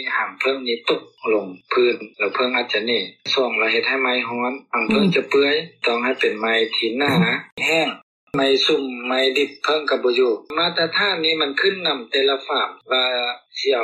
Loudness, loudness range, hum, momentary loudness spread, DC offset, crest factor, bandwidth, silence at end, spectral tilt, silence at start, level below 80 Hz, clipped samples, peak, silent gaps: -19 LUFS; 1 LU; none; 6 LU; under 0.1%; 14 dB; 13 kHz; 0 s; -4.5 dB/octave; 0 s; -66 dBFS; under 0.1%; -6 dBFS; 7.52-7.57 s, 8.03-8.27 s